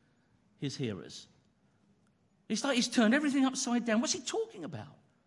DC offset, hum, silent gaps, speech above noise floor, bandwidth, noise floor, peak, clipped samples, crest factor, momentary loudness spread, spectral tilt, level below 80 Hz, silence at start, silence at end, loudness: under 0.1%; none; none; 39 dB; 11.5 kHz; -70 dBFS; -16 dBFS; under 0.1%; 18 dB; 18 LU; -3.5 dB/octave; -80 dBFS; 0.6 s; 0.35 s; -31 LUFS